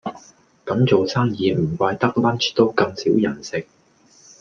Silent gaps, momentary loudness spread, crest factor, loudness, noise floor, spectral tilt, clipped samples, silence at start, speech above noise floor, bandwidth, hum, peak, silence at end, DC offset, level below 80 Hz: none; 11 LU; 18 dB; -20 LUFS; -54 dBFS; -6 dB/octave; under 0.1%; 0.05 s; 35 dB; 7.4 kHz; none; -2 dBFS; 0.8 s; under 0.1%; -58 dBFS